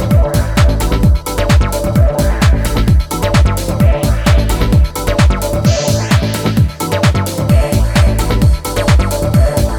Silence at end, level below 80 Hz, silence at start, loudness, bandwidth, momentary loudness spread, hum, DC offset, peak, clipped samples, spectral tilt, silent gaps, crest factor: 0 s; -14 dBFS; 0 s; -13 LUFS; 18.5 kHz; 2 LU; none; under 0.1%; 0 dBFS; under 0.1%; -6 dB/octave; none; 10 dB